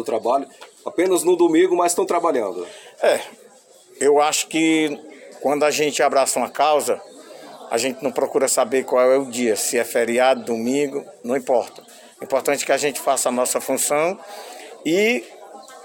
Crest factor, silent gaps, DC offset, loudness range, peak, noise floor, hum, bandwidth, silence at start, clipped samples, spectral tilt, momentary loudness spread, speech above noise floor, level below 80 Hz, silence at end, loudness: 14 dB; none; under 0.1%; 2 LU; -6 dBFS; -49 dBFS; none; 17 kHz; 0 s; under 0.1%; -2.5 dB/octave; 17 LU; 30 dB; -72 dBFS; 0 s; -20 LUFS